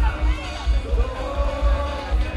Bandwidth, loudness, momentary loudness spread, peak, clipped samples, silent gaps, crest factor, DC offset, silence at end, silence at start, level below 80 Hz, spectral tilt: 9.6 kHz; -24 LUFS; 3 LU; -8 dBFS; under 0.1%; none; 12 dB; under 0.1%; 0 s; 0 s; -22 dBFS; -6.5 dB/octave